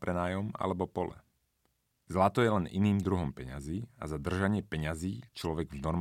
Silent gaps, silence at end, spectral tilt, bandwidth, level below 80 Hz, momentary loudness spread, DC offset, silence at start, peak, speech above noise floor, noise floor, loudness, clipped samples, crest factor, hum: none; 0 s; -7 dB/octave; 15 kHz; -54 dBFS; 10 LU; under 0.1%; 0 s; -12 dBFS; 45 dB; -77 dBFS; -33 LUFS; under 0.1%; 22 dB; none